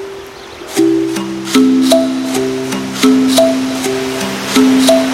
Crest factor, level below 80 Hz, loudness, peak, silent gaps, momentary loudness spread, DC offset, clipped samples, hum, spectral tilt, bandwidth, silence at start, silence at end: 12 dB; -48 dBFS; -12 LUFS; 0 dBFS; none; 10 LU; under 0.1%; under 0.1%; none; -3.5 dB/octave; 16.5 kHz; 0 s; 0 s